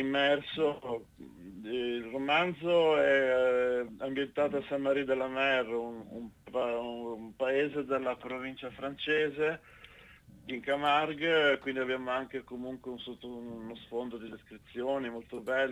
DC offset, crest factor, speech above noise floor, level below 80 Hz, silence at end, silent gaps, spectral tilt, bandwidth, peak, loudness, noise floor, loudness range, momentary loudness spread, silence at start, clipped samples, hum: under 0.1%; 18 dB; 24 dB; -66 dBFS; 0 s; none; -5.5 dB/octave; 11.5 kHz; -14 dBFS; -32 LUFS; -56 dBFS; 7 LU; 16 LU; 0 s; under 0.1%; none